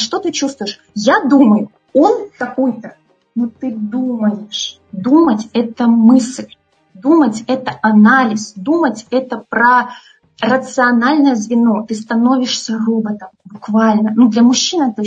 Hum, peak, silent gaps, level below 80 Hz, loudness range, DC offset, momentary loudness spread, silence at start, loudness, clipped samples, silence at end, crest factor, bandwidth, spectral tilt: none; 0 dBFS; none; -62 dBFS; 4 LU; under 0.1%; 12 LU; 0 s; -14 LUFS; under 0.1%; 0 s; 14 dB; 9 kHz; -4.5 dB/octave